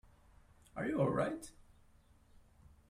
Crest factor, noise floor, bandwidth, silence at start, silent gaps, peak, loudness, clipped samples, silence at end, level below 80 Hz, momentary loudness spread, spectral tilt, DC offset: 20 dB; -66 dBFS; 15 kHz; 0.75 s; none; -22 dBFS; -37 LUFS; under 0.1%; 1.4 s; -64 dBFS; 17 LU; -7 dB/octave; under 0.1%